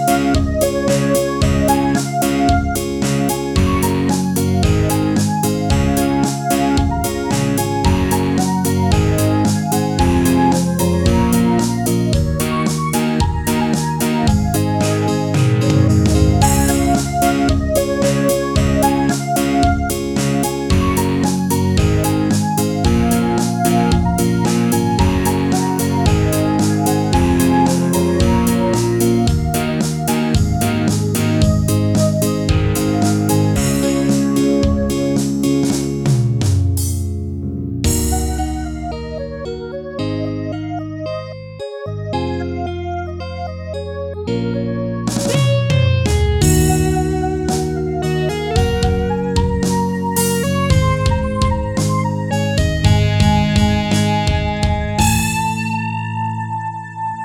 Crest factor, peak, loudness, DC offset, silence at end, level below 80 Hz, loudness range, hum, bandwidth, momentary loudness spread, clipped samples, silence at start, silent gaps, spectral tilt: 16 dB; 0 dBFS; -16 LUFS; under 0.1%; 0 s; -26 dBFS; 6 LU; none; 19.5 kHz; 8 LU; under 0.1%; 0 s; none; -5.5 dB/octave